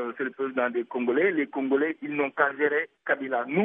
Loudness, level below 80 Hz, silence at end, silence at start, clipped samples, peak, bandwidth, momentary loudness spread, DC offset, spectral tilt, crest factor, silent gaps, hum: -27 LUFS; -84 dBFS; 0 s; 0 s; under 0.1%; -8 dBFS; 3.8 kHz; 5 LU; under 0.1%; -9.5 dB/octave; 18 dB; none; none